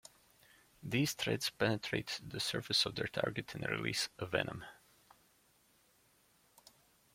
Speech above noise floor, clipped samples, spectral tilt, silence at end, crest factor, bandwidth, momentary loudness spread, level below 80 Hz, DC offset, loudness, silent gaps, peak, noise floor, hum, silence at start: 34 dB; under 0.1%; -3.5 dB/octave; 2.4 s; 24 dB; 16.5 kHz; 9 LU; -68 dBFS; under 0.1%; -36 LUFS; none; -16 dBFS; -71 dBFS; none; 0.8 s